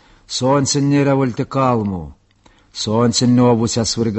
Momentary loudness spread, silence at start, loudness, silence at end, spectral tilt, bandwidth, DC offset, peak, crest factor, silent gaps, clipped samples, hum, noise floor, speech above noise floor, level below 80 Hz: 11 LU; 0.3 s; -16 LUFS; 0 s; -5 dB/octave; 8.6 kHz; under 0.1%; -2 dBFS; 14 dB; none; under 0.1%; none; -52 dBFS; 37 dB; -44 dBFS